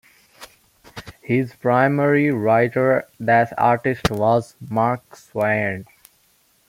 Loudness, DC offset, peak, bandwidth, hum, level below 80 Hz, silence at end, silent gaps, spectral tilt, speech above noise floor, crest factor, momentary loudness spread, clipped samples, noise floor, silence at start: -19 LUFS; under 0.1%; -2 dBFS; 16.5 kHz; none; -48 dBFS; 0.85 s; none; -7 dB/octave; 41 dB; 18 dB; 15 LU; under 0.1%; -60 dBFS; 0.4 s